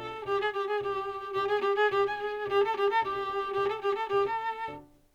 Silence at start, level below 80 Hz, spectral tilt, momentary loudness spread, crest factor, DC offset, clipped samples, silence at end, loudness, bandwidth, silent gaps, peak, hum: 0 s; -62 dBFS; -5 dB/octave; 8 LU; 16 dB; under 0.1%; under 0.1%; 0.3 s; -30 LUFS; 7.8 kHz; none; -14 dBFS; none